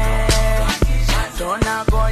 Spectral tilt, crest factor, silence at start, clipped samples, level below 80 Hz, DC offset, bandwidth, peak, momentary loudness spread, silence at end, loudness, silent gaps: -4.5 dB/octave; 12 dB; 0 s; under 0.1%; -18 dBFS; under 0.1%; 14 kHz; -4 dBFS; 4 LU; 0 s; -19 LUFS; none